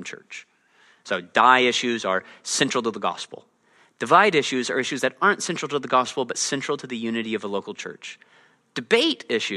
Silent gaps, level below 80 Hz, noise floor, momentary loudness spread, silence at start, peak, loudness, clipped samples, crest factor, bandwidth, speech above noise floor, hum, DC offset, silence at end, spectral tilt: none; -74 dBFS; -60 dBFS; 18 LU; 0 s; 0 dBFS; -22 LUFS; under 0.1%; 22 dB; 12.5 kHz; 37 dB; none; under 0.1%; 0 s; -2.5 dB/octave